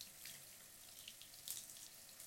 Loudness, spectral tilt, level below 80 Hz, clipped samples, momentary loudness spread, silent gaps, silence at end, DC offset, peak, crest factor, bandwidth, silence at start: -53 LUFS; 0.5 dB/octave; -84 dBFS; under 0.1%; 8 LU; none; 0 s; under 0.1%; -28 dBFS; 28 dB; 17 kHz; 0 s